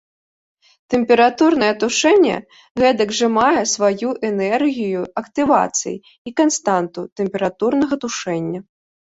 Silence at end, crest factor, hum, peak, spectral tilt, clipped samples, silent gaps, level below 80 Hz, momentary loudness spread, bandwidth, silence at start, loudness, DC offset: 0.6 s; 16 dB; none; -2 dBFS; -3.5 dB/octave; under 0.1%; 2.71-2.75 s, 6.18-6.25 s, 7.12-7.16 s; -56 dBFS; 11 LU; 8 kHz; 0.9 s; -17 LUFS; under 0.1%